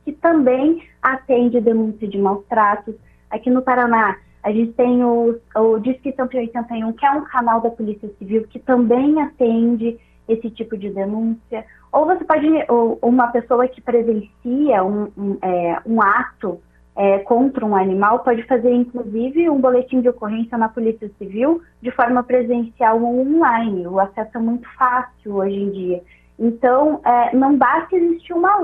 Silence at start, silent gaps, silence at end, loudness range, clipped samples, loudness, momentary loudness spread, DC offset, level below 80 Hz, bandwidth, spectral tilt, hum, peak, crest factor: 0.05 s; none; 0 s; 2 LU; under 0.1%; -18 LUFS; 9 LU; under 0.1%; -52 dBFS; 3.8 kHz; -9.5 dB/octave; none; -2 dBFS; 16 dB